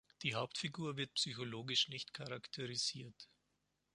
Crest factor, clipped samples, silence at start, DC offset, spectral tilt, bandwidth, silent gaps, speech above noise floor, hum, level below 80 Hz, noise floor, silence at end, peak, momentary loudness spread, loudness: 22 dB; under 0.1%; 0.2 s; under 0.1%; -3 dB/octave; 11.5 kHz; none; 41 dB; 50 Hz at -75 dBFS; -78 dBFS; -84 dBFS; 0.7 s; -22 dBFS; 15 LU; -40 LUFS